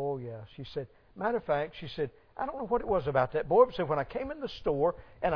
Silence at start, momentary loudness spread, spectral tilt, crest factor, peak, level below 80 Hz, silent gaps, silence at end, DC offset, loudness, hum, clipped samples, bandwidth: 0 s; 15 LU; -8.5 dB/octave; 20 dB; -10 dBFS; -52 dBFS; none; 0 s; under 0.1%; -31 LUFS; none; under 0.1%; 5.4 kHz